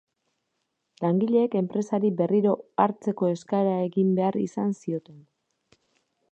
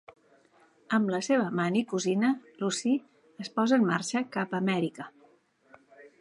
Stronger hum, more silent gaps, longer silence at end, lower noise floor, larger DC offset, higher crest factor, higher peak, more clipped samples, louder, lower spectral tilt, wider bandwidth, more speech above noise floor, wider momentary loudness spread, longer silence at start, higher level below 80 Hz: neither; neither; first, 1.1 s vs 0.15 s; first, -78 dBFS vs -63 dBFS; neither; about the same, 20 dB vs 18 dB; first, -6 dBFS vs -12 dBFS; neither; first, -25 LUFS vs -28 LUFS; first, -8.5 dB/octave vs -5 dB/octave; second, 8.4 kHz vs 11.5 kHz; first, 54 dB vs 35 dB; second, 6 LU vs 9 LU; about the same, 1 s vs 0.9 s; about the same, -76 dBFS vs -80 dBFS